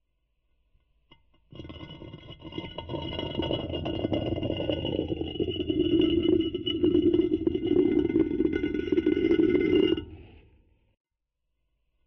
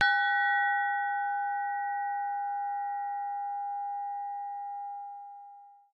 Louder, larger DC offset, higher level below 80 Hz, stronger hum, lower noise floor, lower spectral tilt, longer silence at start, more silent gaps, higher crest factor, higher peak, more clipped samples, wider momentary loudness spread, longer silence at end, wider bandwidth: first, -27 LUFS vs -31 LUFS; neither; first, -48 dBFS vs -86 dBFS; neither; first, -81 dBFS vs -53 dBFS; first, -8.5 dB/octave vs -0.5 dB/octave; first, 1.55 s vs 0 s; neither; about the same, 14 dB vs 18 dB; about the same, -14 dBFS vs -14 dBFS; neither; first, 20 LU vs 16 LU; first, 1.8 s vs 0.2 s; about the same, 5.8 kHz vs 5.6 kHz